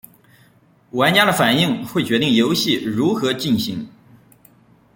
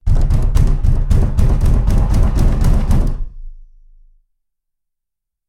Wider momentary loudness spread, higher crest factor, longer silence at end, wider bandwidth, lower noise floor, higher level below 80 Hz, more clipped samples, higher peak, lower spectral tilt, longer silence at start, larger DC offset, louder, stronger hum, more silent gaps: first, 11 LU vs 3 LU; first, 18 dB vs 12 dB; second, 1.1 s vs 1.85 s; first, 17 kHz vs 11.5 kHz; second, -54 dBFS vs -79 dBFS; second, -58 dBFS vs -14 dBFS; neither; about the same, -2 dBFS vs 0 dBFS; second, -4.5 dB/octave vs -8 dB/octave; first, 0.95 s vs 0.05 s; neither; about the same, -17 LUFS vs -17 LUFS; neither; neither